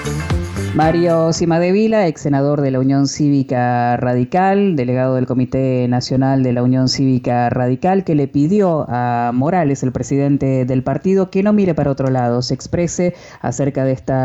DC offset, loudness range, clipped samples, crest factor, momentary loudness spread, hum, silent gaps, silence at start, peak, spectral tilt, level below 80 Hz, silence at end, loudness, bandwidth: under 0.1%; 1 LU; under 0.1%; 10 dB; 5 LU; none; none; 0 s; -4 dBFS; -7 dB/octave; -40 dBFS; 0 s; -16 LUFS; 11.5 kHz